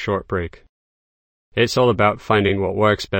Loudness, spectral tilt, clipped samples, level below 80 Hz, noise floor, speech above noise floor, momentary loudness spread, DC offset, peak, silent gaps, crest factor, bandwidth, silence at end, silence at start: -19 LUFS; -6 dB/octave; under 0.1%; -46 dBFS; under -90 dBFS; over 72 dB; 10 LU; under 0.1%; -2 dBFS; 0.69-1.52 s; 18 dB; 16.5 kHz; 0 s; 0 s